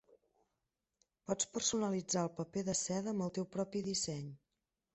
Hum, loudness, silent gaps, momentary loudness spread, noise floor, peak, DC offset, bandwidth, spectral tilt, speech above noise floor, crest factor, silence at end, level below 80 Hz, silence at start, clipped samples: none; -38 LUFS; none; 7 LU; -89 dBFS; -22 dBFS; under 0.1%; 8.4 kHz; -4 dB/octave; 51 dB; 18 dB; 0.6 s; -72 dBFS; 1.3 s; under 0.1%